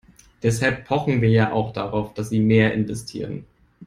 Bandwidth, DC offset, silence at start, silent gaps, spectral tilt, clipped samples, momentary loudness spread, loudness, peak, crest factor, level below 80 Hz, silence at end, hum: 12.5 kHz; under 0.1%; 0.45 s; none; -6.5 dB/octave; under 0.1%; 13 LU; -21 LUFS; -4 dBFS; 18 dB; -48 dBFS; 0 s; none